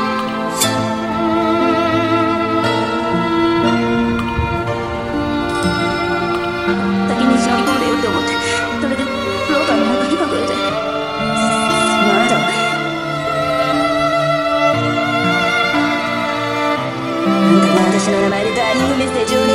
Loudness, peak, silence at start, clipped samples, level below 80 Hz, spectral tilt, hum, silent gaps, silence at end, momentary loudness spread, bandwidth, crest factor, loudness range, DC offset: -16 LUFS; 0 dBFS; 0 s; under 0.1%; -40 dBFS; -4.5 dB/octave; none; none; 0 s; 6 LU; 16 kHz; 16 dB; 2 LU; 0.2%